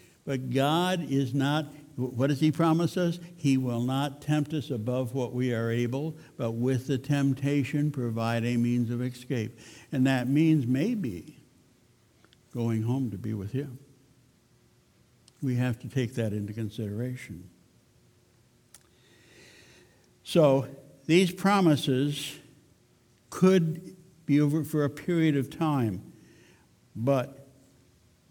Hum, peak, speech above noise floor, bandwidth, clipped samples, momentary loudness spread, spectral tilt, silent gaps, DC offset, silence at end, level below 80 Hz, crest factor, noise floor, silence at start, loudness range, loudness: none; -8 dBFS; 36 dB; 18.5 kHz; under 0.1%; 14 LU; -7 dB/octave; none; under 0.1%; 0.9 s; -66 dBFS; 20 dB; -63 dBFS; 0.25 s; 8 LU; -28 LUFS